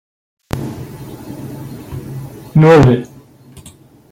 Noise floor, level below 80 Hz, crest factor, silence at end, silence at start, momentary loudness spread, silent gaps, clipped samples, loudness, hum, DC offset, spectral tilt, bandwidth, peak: -42 dBFS; -40 dBFS; 16 dB; 1.05 s; 0.55 s; 23 LU; none; under 0.1%; -11 LUFS; none; under 0.1%; -8 dB/octave; 16.5 kHz; 0 dBFS